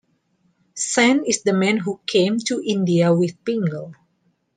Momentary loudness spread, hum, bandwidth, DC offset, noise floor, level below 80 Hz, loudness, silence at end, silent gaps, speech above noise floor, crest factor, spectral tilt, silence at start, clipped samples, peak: 10 LU; none; 9.6 kHz; under 0.1%; -66 dBFS; -68 dBFS; -19 LUFS; 0.65 s; none; 47 dB; 18 dB; -4.5 dB/octave; 0.75 s; under 0.1%; -2 dBFS